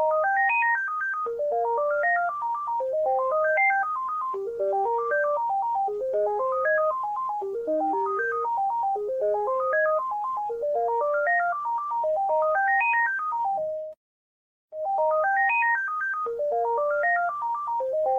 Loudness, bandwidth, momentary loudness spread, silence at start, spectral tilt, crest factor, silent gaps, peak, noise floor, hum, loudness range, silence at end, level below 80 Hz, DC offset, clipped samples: -25 LUFS; 7.2 kHz; 7 LU; 0 s; -5 dB/octave; 12 dB; 13.97-14.68 s; -14 dBFS; under -90 dBFS; none; 2 LU; 0 s; -70 dBFS; under 0.1%; under 0.1%